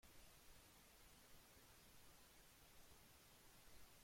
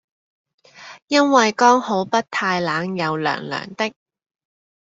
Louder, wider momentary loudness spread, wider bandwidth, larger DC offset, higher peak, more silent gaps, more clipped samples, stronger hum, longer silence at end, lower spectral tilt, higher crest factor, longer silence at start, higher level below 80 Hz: second, -67 LUFS vs -19 LUFS; second, 1 LU vs 11 LU; first, 16.5 kHz vs 8 kHz; neither; second, -52 dBFS vs -2 dBFS; second, none vs 1.02-1.07 s; neither; neither; second, 0 s vs 1.05 s; second, -2.5 dB/octave vs -4 dB/octave; second, 14 dB vs 20 dB; second, 0 s vs 0.8 s; second, -76 dBFS vs -66 dBFS